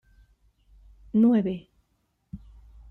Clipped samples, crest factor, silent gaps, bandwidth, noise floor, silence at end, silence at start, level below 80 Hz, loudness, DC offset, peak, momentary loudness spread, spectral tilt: under 0.1%; 18 dB; none; 4 kHz; -73 dBFS; 0.55 s; 1.15 s; -54 dBFS; -24 LUFS; under 0.1%; -12 dBFS; 25 LU; -10.5 dB/octave